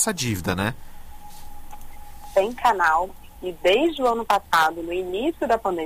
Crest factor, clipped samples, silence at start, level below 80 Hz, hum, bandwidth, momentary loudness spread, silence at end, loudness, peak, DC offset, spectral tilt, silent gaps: 16 dB; under 0.1%; 0 s; -42 dBFS; none; 16 kHz; 9 LU; 0 s; -22 LUFS; -8 dBFS; under 0.1%; -4 dB/octave; none